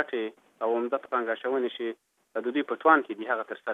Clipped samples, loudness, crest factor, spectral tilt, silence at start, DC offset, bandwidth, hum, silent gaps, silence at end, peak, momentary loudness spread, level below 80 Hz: under 0.1%; -28 LUFS; 22 dB; -5.5 dB/octave; 0 s; under 0.1%; 4 kHz; none; none; 0 s; -6 dBFS; 14 LU; -88 dBFS